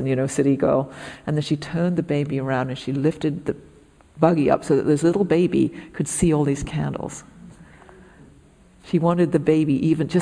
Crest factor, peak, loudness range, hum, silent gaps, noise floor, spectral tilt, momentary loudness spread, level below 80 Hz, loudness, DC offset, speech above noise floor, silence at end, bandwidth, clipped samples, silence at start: 18 dB; -4 dBFS; 5 LU; none; none; -52 dBFS; -6.5 dB/octave; 10 LU; -46 dBFS; -21 LUFS; under 0.1%; 31 dB; 0 s; 10.5 kHz; under 0.1%; 0 s